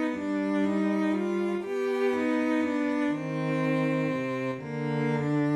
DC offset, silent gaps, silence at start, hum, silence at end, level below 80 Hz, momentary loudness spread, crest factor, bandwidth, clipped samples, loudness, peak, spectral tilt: under 0.1%; none; 0 s; none; 0 s; -70 dBFS; 4 LU; 12 dB; 11.5 kHz; under 0.1%; -28 LUFS; -16 dBFS; -7.5 dB/octave